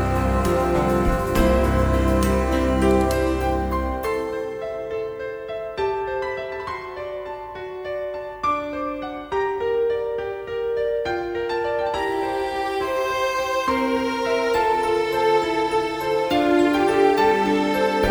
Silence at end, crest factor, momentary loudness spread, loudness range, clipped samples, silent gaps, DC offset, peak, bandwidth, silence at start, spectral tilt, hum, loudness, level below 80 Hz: 0 s; 16 dB; 11 LU; 8 LU; under 0.1%; none; under 0.1%; -6 dBFS; over 20 kHz; 0 s; -6 dB/octave; none; -22 LUFS; -32 dBFS